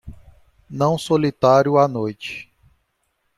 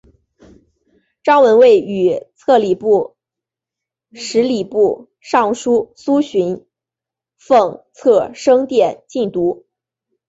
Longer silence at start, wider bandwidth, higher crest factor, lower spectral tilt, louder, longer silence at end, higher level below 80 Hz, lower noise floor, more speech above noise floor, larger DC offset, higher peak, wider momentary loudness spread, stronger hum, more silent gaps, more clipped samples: second, 0.05 s vs 1.25 s; first, 13.5 kHz vs 8 kHz; about the same, 18 dB vs 14 dB; about the same, -6.5 dB/octave vs -5.5 dB/octave; second, -18 LUFS vs -15 LUFS; first, 0.95 s vs 0.75 s; first, -52 dBFS vs -60 dBFS; second, -70 dBFS vs -87 dBFS; second, 52 dB vs 73 dB; neither; about the same, -2 dBFS vs -2 dBFS; first, 17 LU vs 11 LU; neither; neither; neither